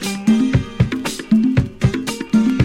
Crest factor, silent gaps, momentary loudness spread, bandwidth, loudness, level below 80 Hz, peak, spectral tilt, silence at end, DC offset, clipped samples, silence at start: 14 dB; none; 5 LU; 16 kHz; -18 LUFS; -34 dBFS; -2 dBFS; -6.5 dB/octave; 0 s; under 0.1%; under 0.1%; 0 s